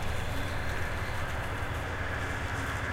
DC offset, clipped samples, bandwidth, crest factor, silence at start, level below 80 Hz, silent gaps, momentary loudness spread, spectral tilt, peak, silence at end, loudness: under 0.1%; under 0.1%; 16.5 kHz; 12 dB; 0 s; -38 dBFS; none; 1 LU; -5 dB/octave; -20 dBFS; 0 s; -34 LUFS